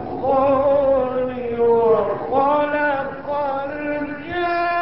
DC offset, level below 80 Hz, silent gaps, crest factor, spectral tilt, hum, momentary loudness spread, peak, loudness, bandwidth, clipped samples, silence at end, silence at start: 0.6%; -48 dBFS; none; 14 dB; -10.5 dB/octave; none; 9 LU; -6 dBFS; -20 LUFS; 5.8 kHz; under 0.1%; 0 s; 0 s